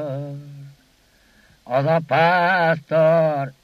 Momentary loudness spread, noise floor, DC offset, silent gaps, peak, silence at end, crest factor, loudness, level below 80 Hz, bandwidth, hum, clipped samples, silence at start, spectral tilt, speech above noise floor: 14 LU; -57 dBFS; under 0.1%; none; -6 dBFS; 0.1 s; 14 dB; -18 LUFS; -64 dBFS; 13 kHz; none; under 0.1%; 0 s; -7.5 dB/octave; 39 dB